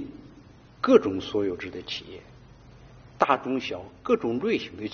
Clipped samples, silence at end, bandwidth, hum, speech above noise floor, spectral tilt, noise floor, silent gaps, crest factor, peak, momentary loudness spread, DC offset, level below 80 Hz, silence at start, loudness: under 0.1%; 0 s; 6.8 kHz; none; 25 dB; -3.5 dB/octave; -51 dBFS; none; 24 dB; -4 dBFS; 15 LU; under 0.1%; -58 dBFS; 0 s; -26 LUFS